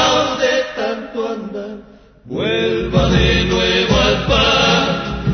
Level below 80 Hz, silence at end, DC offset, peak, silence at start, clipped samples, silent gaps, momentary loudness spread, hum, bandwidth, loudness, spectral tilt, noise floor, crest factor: -28 dBFS; 0 s; under 0.1%; 0 dBFS; 0 s; under 0.1%; none; 14 LU; none; 6.6 kHz; -15 LUFS; -4.5 dB/octave; -41 dBFS; 16 dB